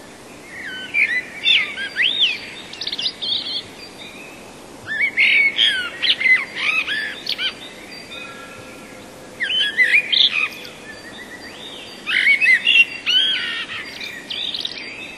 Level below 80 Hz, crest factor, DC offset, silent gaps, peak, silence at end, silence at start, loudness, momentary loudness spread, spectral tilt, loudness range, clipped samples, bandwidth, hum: -60 dBFS; 18 dB; under 0.1%; none; -2 dBFS; 0 s; 0 s; -16 LUFS; 23 LU; -0.5 dB/octave; 6 LU; under 0.1%; 13.5 kHz; none